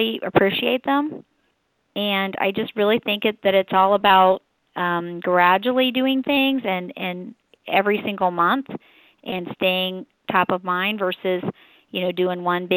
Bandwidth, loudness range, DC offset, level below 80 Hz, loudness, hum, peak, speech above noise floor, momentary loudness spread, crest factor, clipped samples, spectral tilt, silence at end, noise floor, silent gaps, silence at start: 19.5 kHz; 5 LU; under 0.1%; -62 dBFS; -21 LUFS; none; -2 dBFS; 48 dB; 14 LU; 18 dB; under 0.1%; -8.5 dB/octave; 0 s; -69 dBFS; none; 0 s